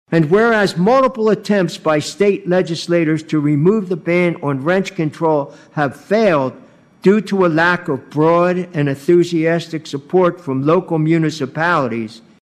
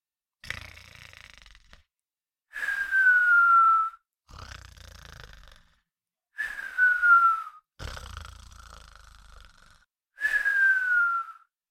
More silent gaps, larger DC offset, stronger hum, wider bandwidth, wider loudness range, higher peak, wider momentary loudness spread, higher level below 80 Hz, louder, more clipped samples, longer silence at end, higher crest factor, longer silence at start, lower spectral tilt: neither; neither; neither; second, 13 kHz vs 15 kHz; second, 2 LU vs 8 LU; first, -2 dBFS vs -10 dBFS; second, 7 LU vs 25 LU; about the same, -56 dBFS vs -54 dBFS; first, -16 LUFS vs -22 LUFS; neither; second, 0.25 s vs 0.4 s; about the same, 14 dB vs 18 dB; second, 0.1 s vs 0.45 s; first, -6.5 dB/octave vs -1.5 dB/octave